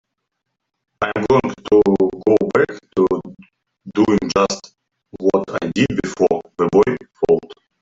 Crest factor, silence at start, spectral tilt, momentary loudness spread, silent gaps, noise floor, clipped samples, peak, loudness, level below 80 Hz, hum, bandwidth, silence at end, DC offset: 16 dB; 1 s; -6 dB/octave; 8 LU; none; -42 dBFS; under 0.1%; -2 dBFS; -18 LUFS; -48 dBFS; none; 7.8 kHz; 0.3 s; under 0.1%